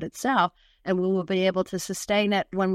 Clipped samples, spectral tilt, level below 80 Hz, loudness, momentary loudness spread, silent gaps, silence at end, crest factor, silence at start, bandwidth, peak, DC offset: under 0.1%; -5 dB/octave; -60 dBFS; -25 LUFS; 6 LU; none; 0 s; 16 dB; 0 s; 15.5 kHz; -8 dBFS; under 0.1%